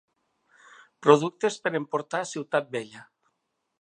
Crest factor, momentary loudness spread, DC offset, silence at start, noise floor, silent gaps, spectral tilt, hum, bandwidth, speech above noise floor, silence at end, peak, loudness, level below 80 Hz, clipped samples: 26 dB; 14 LU; under 0.1%; 1 s; -78 dBFS; none; -5 dB/octave; none; 9.8 kHz; 52 dB; 0.8 s; -2 dBFS; -26 LUFS; -82 dBFS; under 0.1%